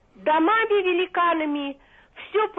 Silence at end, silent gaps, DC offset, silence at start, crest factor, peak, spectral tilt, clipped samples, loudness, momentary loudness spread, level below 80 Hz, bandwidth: 0.05 s; none; under 0.1%; 0.2 s; 12 dB; -12 dBFS; -6.5 dB/octave; under 0.1%; -22 LUFS; 11 LU; -62 dBFS; 4 kHz